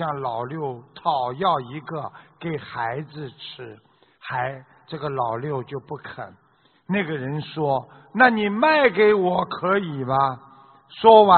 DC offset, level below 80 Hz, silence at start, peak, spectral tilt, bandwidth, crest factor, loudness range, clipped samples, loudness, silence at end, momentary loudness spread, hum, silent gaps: under 0.1%; -62 dBFS; 0 s; 0 dBFS; -3.5 dB/octave; 4.5 kHz; 22 dB; 11 LU; under 0.1%; -22 LUFS; 0 s; 20 LU; none; none